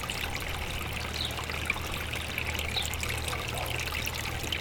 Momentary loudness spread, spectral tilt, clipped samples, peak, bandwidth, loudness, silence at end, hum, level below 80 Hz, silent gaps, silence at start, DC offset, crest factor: 3 LU; -3 dB/octave; under 0.1%; -14 dBFS; over 20 kHz; -32 LUFS; 0 s; none; -42 dBFS; none; 0 s; under 0.1%; 18 dB